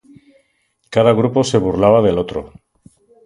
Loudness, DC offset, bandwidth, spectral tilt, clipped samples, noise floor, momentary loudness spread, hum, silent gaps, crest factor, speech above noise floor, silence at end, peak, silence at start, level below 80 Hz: -15 LUFS; under 0.1%; 11.5 kHz; -6.5 dB/octave; under 0.1%; -64 dBFS; 10 LU; none; none; 16 dB; 50 dB; 0.8 s; 0 dBFS; 0.9 s; -44 dBFS